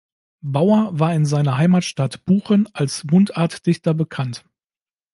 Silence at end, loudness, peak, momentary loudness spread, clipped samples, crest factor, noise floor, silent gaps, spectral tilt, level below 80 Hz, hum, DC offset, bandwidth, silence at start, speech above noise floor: 0.75 s; -19 LUFS; -2 dBFS; 9 LU; under 0.1%; 16 dB; under -90 dBFS; none; -7 dB/octave; -60 dBFS; none; under 0.1%; 11.5 kHz; 0.45 s; over 72 dB